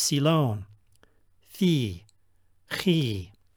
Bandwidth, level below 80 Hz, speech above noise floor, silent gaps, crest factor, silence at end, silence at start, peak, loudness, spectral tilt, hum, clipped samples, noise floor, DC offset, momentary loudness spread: over 20 kHz; -62 dBFS; 42 dB; none; 18 dB; 0.3 s; 0 s; -10 dBFS; -26 LUFS; -5 dB/octave; none; under 0.1%; -67 dBFS; under 0.1%; 14 LU